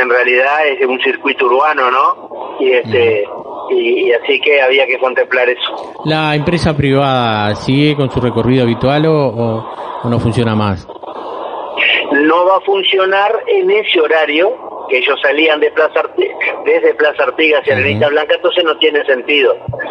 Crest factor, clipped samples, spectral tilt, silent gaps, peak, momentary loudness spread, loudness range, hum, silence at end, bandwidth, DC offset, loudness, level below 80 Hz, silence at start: 12 dB; under 0.1%; -6.5 dB/octave; none; 0 dBFS; 8 LU; 2 LU; none; 0 s; 10 kHz; under 0.1%; -12 LUFS; -44 dBFS; 0 s